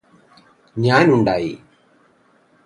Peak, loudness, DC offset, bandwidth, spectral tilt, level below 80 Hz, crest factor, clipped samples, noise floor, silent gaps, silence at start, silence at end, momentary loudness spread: 0 dBFS; -17 LUFS; under 0.1%; 11.5 kHz; -7 dB/octave; -54 dBFS; 20 dB; under 0.1%; -57 dBFS; none; 0.75 s; 1.1 s; 19 LU